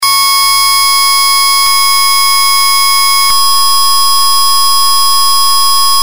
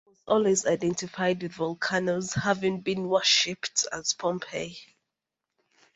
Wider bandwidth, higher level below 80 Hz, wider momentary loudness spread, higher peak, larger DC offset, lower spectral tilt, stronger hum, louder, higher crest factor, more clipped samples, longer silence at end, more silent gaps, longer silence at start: first, 16.5 kHz vs 8.2 kHz; first, -48 dBFS vs -64 dBFS; second, 1 LU vs 10 LU; first, 0 dBFS vs -8 dBFS; first, 10% vs under 0.1%; second, 3 dB/octave vs -3 dB/octave; neither; first, -6 LUFS vs -26 LUFS; second, 10 dB vs 20 dB; first, 0.2% vs under 0.1%; second, 0 s vs 1.1 s; neither; second, 0 s vs 0.25 s